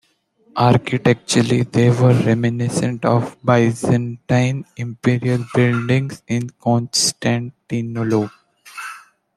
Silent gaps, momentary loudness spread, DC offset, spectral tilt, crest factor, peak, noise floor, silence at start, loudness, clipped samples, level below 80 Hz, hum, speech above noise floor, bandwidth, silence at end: none; 11 LU; under 0.1%; -5.5 dB/octave; 16 dB; -2 dBFS; -58 dBFS; 0.55 s; -18 LUFS; under 0.1%; -54 dBFS; none; 40 dB; 13 kHz; 0.4 s